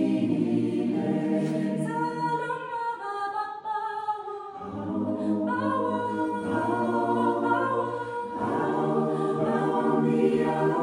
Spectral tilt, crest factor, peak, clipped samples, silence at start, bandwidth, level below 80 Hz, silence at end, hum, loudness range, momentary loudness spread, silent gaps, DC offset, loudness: -7.5 dB/octave; 16 dB; -12 dBFS; under 0.1%; 0 s; 11 kHz; -66 dBFS; 0 s; none; 5 LU; 7 LU; none; under 0.1%; -27 LUFS